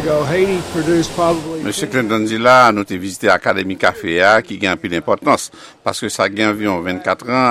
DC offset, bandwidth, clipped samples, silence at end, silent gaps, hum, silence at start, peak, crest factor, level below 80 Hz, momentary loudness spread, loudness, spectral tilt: under 0.1%; 15.5 kHz; under 0.1%; 0 s; none; none; 0 s; 0 dBFS; 16 dB; -48 dBFS; 9 LU; -16 LUFS; -4.5 dB/octave